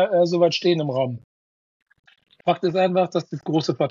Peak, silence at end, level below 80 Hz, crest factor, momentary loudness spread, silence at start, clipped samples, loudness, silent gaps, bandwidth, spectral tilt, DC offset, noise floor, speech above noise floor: -6 dBFS; 0 s; -74 dBFS; 16 dB; 9 LU; 0 s; under 0.1%; -22 LUFS; 1.24-1.86 s, 1.99-2.03 s; 7.4 kHz; -6.5 dB/octave; under 0.1%; under -90 dBFS; over 69 dB